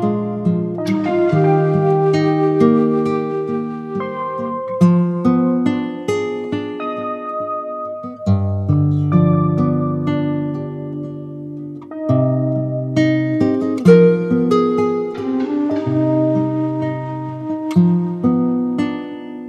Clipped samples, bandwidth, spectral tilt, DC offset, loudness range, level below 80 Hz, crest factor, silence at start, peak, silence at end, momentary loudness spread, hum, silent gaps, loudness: under 0.1%; 8.8 kHz; -9 dB/octave; under 0.1%; 5 LU; -58 dBFS; 16 dB; 0 s; 0 dBFS; 0 s; 11 LU; none; none; -17 LUFS